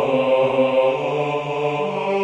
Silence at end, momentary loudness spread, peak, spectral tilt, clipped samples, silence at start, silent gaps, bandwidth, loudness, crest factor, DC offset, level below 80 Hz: 0 s; 5 LU; -6 dBFS; -6.5 dB/octave; under 0.1%; 0 s; none; 8.4 kHz; -20 LUFS; 14 dB; under 0.1%; -60 dBFS